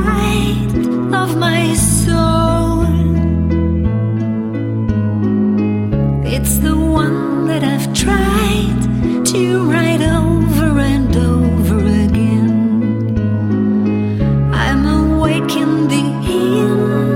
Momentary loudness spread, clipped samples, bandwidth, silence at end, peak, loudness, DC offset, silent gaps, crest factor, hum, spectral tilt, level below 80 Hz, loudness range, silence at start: 3 LU; under 0.1%; 16.5 kHz; 0 s; 0 dBFS; -14 LUFS; under 0.1%; none; 14 dB; none; -6 dB/octave; -24 dBFS; 2 LU; 0 s